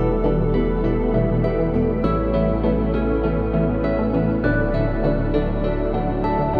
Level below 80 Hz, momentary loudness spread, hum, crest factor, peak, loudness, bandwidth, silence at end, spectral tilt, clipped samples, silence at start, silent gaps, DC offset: -26 dBFS; 2 LU; none; 12 dB; -6 dBFS; -21 LUFS; 4.9 kHz; 0 s; -11 dB/octave; under 0.1%; 0 s; none; under 0.1%